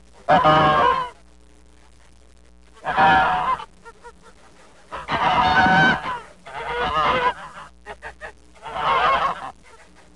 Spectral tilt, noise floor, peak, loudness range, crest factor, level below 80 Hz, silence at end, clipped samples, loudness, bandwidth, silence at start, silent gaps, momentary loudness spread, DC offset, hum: -5 dB/octave; -51 dBFS; -6 dBFS; 4 LU; 16 dB; -46 dBFS; 0.65 s; under 0.1%; -19 LUFS; 11 kHz; 0.3 s; none; 22 LU; 0.3%; none